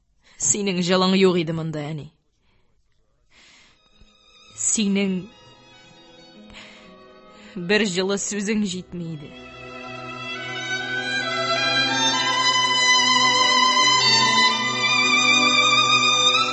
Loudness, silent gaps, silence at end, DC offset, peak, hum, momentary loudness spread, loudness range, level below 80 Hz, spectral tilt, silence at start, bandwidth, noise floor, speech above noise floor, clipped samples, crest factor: -18 LUFS; none; 0 s; under 0.1%; -4 dBFS; none; 18 LU; 12 LU; -60 dBFS; -2 dB/octave; 0.4 s; 8.6 kHz; -63 dBFS; 41 dB; under 0.1%; 18 dB